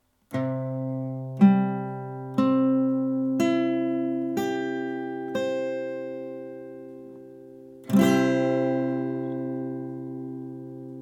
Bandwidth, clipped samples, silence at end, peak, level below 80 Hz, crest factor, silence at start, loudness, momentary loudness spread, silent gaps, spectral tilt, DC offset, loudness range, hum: 16.5 kHz; under 0.1%; 0 s; -6 dBFS; -72 dBFS; 20 dB; 0.3 s; -26 LUFS; 19 LU; none; -7.5 dB/octave; under 0.1%; 7 LU; none